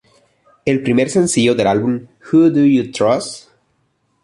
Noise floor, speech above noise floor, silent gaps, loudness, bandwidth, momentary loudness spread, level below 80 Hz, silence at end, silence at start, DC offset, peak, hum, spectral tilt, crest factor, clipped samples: -64 dBFS; 50 dB; none; -15 LUFS; 11.5 kHz; 12 LU; -52 dBFS; 0.85 s; 0.65 s; under 0.1%; -2 dBFS; none; -5.5 dB/octave; 14 dB; under 0.1%